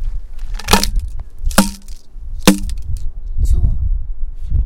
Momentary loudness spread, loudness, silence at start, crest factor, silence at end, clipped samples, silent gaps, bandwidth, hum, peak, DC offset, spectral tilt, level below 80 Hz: 18 LU; -18 LUFS; 0 s; 16 dB; 0 s; 0.2%; none; 17 kHz; none; 0 dBFS; under 0.1%; -4 dB/octave; -18 dBFS